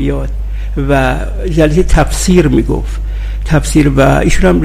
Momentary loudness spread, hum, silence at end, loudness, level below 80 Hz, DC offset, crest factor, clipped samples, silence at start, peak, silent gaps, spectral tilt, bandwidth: 12 LU; 50 Hz at -15 dBFS; 0 s; -12 LUFS; -16 dBFS; under 0.1%; 10 dB; 1%; 0 s; 0 dBFS; none; -6 dB/octave; 15 kHz